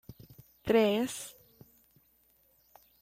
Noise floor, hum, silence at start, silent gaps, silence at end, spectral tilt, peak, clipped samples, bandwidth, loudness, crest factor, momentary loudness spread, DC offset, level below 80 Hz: -68 dBFS; none; 0.1 s; none; 1.7 s; -4.5 dB/octave; -14 dBFS; under 0.1%; 16 kHz; -30 LUFS; 20 dB; 20 LU; under 0.1%; -64 dBFS